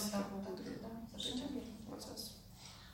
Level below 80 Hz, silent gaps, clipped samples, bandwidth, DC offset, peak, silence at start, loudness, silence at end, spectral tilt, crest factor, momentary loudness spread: -62 dBFS; none; under 0.1%; 16.5 kHz; under 0.1%; -26 dBFS; 0 s; -45 LUFS; 0 s; -4 dB/octave; 18 dB; 11 LU